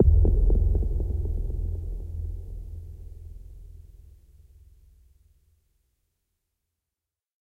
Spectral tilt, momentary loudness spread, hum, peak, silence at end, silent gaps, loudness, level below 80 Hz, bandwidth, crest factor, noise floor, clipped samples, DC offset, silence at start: -11.5 dB/octave; 25 LU; none; -6 dBFS; 3.65 s; none; -28 LUFS; -28 dBFS; 1 kHz; 20 dB; -89 dBFS; under 0.1%; under 0.1%; 0 s